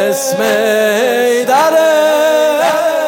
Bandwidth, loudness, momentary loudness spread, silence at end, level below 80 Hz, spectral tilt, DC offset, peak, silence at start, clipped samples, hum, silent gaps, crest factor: 17.5 kHz; -11 LUFS; 3 LU; 0 s; -76 dBFS; -2.5 dB/octave; under 0.1%; 0 dBFS; 0 s; under 0.1%; none; none; 10 dB